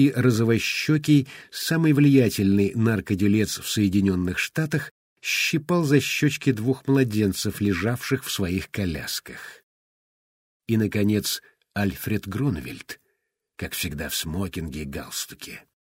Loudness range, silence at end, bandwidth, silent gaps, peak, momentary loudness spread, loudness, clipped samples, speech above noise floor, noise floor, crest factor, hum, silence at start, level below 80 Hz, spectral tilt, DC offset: 8 LU; 0.4 s; 16 kHz; 4.91-5.16 s, 9.63-10.60 s; -6 dBFS; 14 LU; -23 LUFS; under 0.1%; 53 dB; -76 dBFS; 18 dB; none; 0 s; -50 dBFS; -5.5 dB/octave; under 0.1%